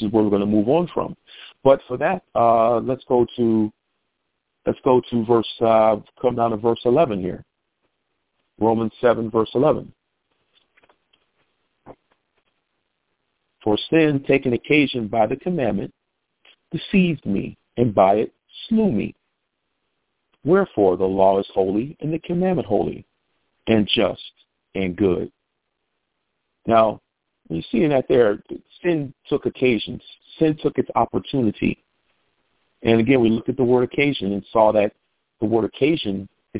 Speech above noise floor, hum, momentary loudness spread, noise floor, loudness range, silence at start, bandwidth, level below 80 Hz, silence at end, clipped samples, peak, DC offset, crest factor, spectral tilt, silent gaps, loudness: 57 dB; none; 13 LU; -76 dBFS; 4 LU; 0 s; 4 kHz; -52 dBFS; 0 s; under 0.1%; -2 dBFS; under 0.1%; 20 dB; -10.5 dB/octave; none; -20 LUFS